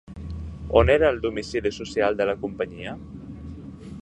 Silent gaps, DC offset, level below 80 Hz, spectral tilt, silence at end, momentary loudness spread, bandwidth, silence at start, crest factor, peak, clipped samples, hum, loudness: none; under 0.1%; -38 dBFS; -6 dB/octave; 0 s; 20 LU; 9.8 kHz; 0.05 s; 24 dB; -2 dBFS; under 0.1%; none; -23 LUFS